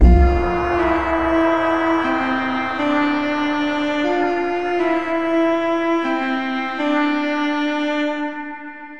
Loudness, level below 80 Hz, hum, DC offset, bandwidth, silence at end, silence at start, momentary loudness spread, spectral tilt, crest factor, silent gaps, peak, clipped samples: -19 LUFS; -24 dBFS; none; 0.9%; 7.4 kHz; 0 s; 0 s; 4 LU; -7 dB/octave; 16 dB; none; -2 dBFS; under 0.1%